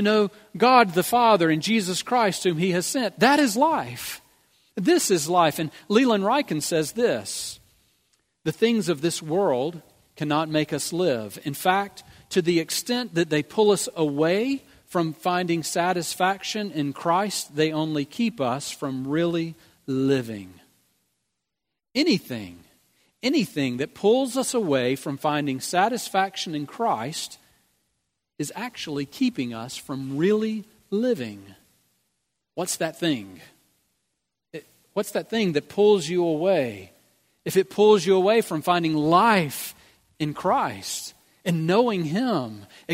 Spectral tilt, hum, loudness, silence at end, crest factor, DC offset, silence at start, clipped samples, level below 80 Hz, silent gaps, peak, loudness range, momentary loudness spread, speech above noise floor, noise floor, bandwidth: -4.5 dB/octave; none; -23 LUFS; 0 s; 22 dB; under 0.1%; 0 s; under 0.1%; -68 dBFS; none; -2 dBFS; 8 LU; 13 LU; 61 dB; -84 dBFS; 16 kHz